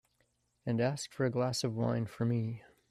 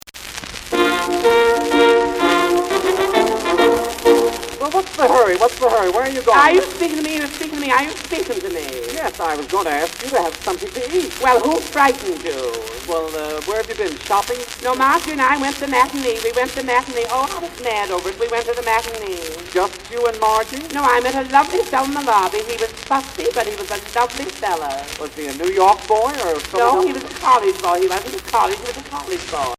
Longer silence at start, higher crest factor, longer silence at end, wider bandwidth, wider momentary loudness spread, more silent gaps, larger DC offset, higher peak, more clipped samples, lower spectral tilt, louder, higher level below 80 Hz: first, 0.65 s vs 0.05 s; about the same, 16 dB vs 18 dB; first, 0.3 s vs 0.05 s; second, 13 kHz vs 16 kHz; second, 7 LU vs 10 LU; neither; neither; second, -18 dBFS vs 0 dBFS; neither; first, -6 dB/octave vs -2.5 dB/octave; second, -34 LUFS vs -18 LUFS; second, -68 dBFS vs -44 dBFS